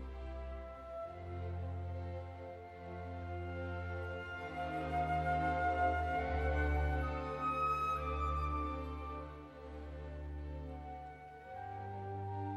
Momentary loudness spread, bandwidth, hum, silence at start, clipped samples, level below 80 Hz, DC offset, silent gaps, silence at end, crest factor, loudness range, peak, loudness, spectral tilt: 14 LU; 7.8 kHz; none; 0 s; under 0.1%; -46 dBFS; under 0.1%; none; 0 s; 16 dB; 10 LU; -24 dBFS; -40 LUFS; -7.5 dB/octave